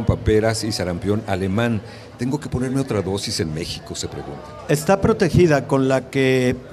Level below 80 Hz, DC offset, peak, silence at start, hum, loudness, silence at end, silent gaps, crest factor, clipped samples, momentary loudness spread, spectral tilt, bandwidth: -38 dBFS; under 0.1%; -4 dBFS; 0 s; none; -20 LUFS; 0 s; none; 16 dB; under 0.1%; 12 LU; -6 dB/octave; 14.5 kHz